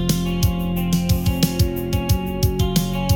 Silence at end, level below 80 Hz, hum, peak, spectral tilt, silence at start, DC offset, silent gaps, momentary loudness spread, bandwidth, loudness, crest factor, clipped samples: 0 s; -28 dBFS; none; -6 dBFS; -5.5 dB/octave; 0 s; under 0.1%; none; 3 LU; 18 kHz; -20 LUFS; 14 dB; under 0.1%